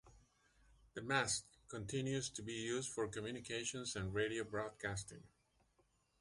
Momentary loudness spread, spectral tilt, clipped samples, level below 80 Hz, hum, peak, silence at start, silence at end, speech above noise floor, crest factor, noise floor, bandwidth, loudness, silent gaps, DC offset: 12 LU; -3.5 dB/octave; under 0.1%; -66 dBFS; none; -20 dBFS; 0.05 s; 0.95 s; 35 dB; 24 dB; -78 dBFS; 11.5 kHz; -42 LUFS; none; under 0.1%